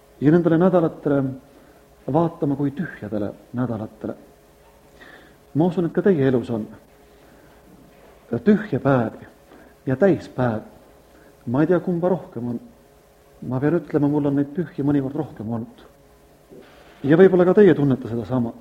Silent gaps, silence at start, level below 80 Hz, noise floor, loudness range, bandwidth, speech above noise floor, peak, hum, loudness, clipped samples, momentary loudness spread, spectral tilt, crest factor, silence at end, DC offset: none; 0.2 s; -56 dBFS; -52 dBFS; 7 LU; 9.2 kHz; 32 dB; -2 dBFS; none; -21 LUFS; under 0.1%; 16 LU; -9.5 dB/octave; 20 dB; 0 s; under 0.1%